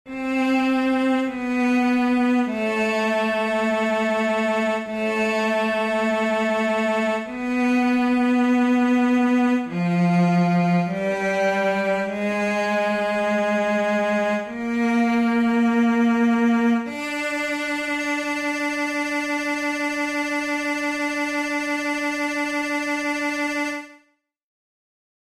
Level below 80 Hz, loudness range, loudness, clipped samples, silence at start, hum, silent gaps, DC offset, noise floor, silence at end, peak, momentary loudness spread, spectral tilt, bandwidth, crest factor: -60 dBFS; 4 LU; -21 LUFS; under 0.1%; 0.05 s; none; none; under 0.1%; -64 dBFS; 1.35 s; -10 dBFS; 5 LU; -6 dB/octave; 14 kHz; 10 dB